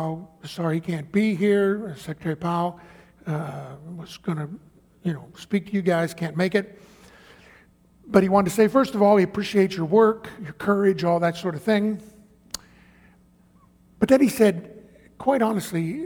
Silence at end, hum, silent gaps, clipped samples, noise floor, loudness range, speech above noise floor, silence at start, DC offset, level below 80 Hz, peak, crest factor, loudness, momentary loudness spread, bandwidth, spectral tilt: 0 s; none; none; under 0.1%; -56 dBFS; 8 LU; 34 dB; 0 s; under 0.1%; -58 dBFS; -2 dBFS; 22 dB; -23 LUFS; 18 LU; 20 kHz; -6.5 dB/octave